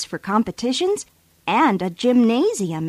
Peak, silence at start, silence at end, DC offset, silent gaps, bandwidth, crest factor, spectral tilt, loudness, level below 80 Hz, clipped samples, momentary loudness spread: -6 dBFS; 0 s; 0 s; under 0.1%; none; 14 kHz; 14 dB; -5 dB/octave; -20 LUFS; -58 dBFS; under 0.1%; 9 LU